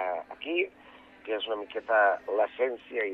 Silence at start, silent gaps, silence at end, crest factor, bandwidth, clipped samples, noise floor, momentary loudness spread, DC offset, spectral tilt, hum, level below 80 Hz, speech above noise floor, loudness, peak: 0 s; none; 0 s; 18 dB; 4.9 kHz; under 0.1%; -53 dBFS; 11 LU; under 0.1%; -4.5 dB/octave; none; -72 dBFS; 25 dB; -29 LUFS; -12 dBFS